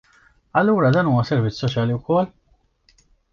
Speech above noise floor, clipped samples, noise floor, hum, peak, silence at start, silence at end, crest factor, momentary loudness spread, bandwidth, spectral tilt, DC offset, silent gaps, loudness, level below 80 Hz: 41 dB; under 0.1%; -60 dBFS; none; -4 dBFS; 0.55 s; 1.05 s; 16 dB; 6 LU; 7 kHz; -8 dB/octave; under 0.1%; none; -20 LUFS; -52 dBFS